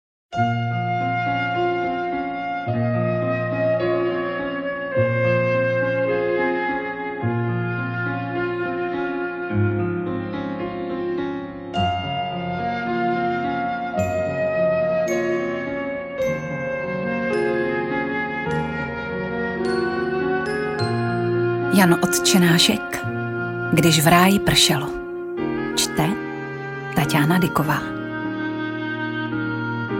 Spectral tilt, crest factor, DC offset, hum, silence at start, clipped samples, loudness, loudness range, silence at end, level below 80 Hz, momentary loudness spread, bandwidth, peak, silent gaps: -5 dB/octave; 18 dB; under 0.1%; none; 0.3 s; under 0.1%; -22 LUFS; 7 LU; 0 s; -50 dBFS; 10 LU; 16.5 kHz; -2 dBFS; none